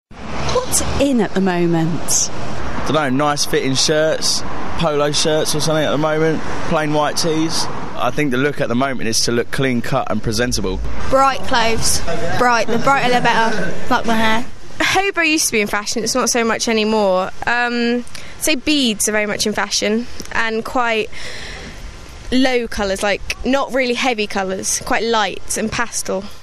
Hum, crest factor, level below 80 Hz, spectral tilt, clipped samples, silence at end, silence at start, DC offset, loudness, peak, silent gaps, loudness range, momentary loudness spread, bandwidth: none; 16 dB; -36 dBFS; -3.5 dB/octave; under 0.1%; 0 s; 0.05 s; under 0.1%; -17 LUFS; 0 dBFS; none; 3 LU; 8 LU; 14 kHz